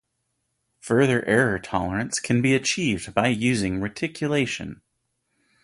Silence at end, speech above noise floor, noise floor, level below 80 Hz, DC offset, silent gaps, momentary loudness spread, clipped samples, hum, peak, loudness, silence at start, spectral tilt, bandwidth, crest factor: 0.9 s; 53 dB; -76 dBFS; -50 dBFS; under 0.1%; none; 8 LU; under 0.1%; none; -4 dBFS; -23 LUFS; 0.85 s; -5 dB/octave; 11.5 kHz; 20 dB